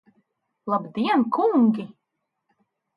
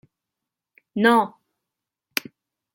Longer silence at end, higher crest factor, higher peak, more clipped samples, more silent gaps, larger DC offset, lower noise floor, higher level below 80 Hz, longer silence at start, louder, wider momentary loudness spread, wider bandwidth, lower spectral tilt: second, 1.1 s vs 1.45 s; second, 16 dB vs 24 dB; second, -10 dBFS vs -2 dBFS; neither; neither; neither; second, -80 dBFS vs -86 dBFS; about the same, -76 dBFS vs -74 dBFS; second, 0.65 s vs 0.95 s; about the same, -22 LUFS vs -22 LUFS; first, 16 LU vs 13 LU; second, 5.2 kHz vs 16.5 kHz; first, -8.5 dB/octave vs -4.5 dB/octave